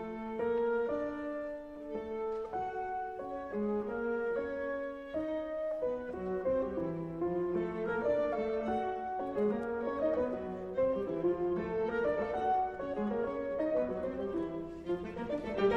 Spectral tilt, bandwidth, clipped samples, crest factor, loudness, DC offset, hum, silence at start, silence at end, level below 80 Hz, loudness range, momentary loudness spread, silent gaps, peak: -8 dB/octave; 7.8 kHz; under 0.1%; 16 dB; -35 LUFS; under 0.1%; none; 0 s; 0 s; -58 dBFS; 3 LU; 7 LU; none; -20 dBFS